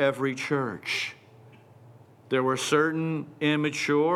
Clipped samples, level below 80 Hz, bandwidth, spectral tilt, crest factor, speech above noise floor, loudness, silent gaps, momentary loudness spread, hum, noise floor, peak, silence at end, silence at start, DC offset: under 0.1%; -80 dBFS; 14.5 kHz; -5 dB/octave; 18 dB; 26 dB; -27 LUFS; none; 6 LU; none; -52 dBFS; -10 dBFS; 0 s; 0 s; under 0.1%